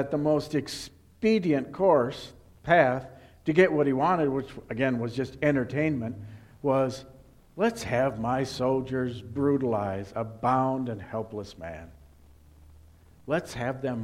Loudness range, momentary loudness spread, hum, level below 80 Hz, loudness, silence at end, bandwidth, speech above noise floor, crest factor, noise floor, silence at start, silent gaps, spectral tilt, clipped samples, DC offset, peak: 7 LU; 17 LU; none; -56 dBFS; -27 LUFS; 0 s; 14.5 kHz; 28 dB; 20 dB; -55 dBFS; 0 s; none; -6.5 dB/octave; under 0.1%; under 0.1%; -6 dBFS